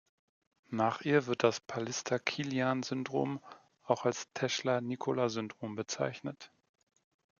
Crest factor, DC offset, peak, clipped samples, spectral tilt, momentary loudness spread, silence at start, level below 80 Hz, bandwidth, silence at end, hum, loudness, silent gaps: 22 dB; under 0.1%; -12 dBFS; under 0.1%; -4.5 dB/octave; 10 LU; 0.7 s; -80 dBFS; 7.4 kHz; 0.9 s; none; -34 LUFS; none